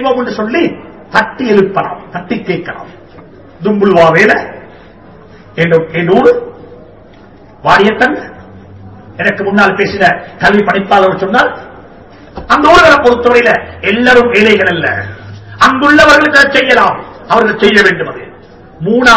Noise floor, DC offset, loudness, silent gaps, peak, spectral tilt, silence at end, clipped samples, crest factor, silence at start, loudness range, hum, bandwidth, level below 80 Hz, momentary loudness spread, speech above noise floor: -37 dBFS; 0.5%; -8 LUFS; none; 0 dBFS; -5 dB/octave; 0 s; 4%; 10 dB; 0 s; 6 LU; none; 8 kHz; -38 dBFS; 17 LU; 28 dB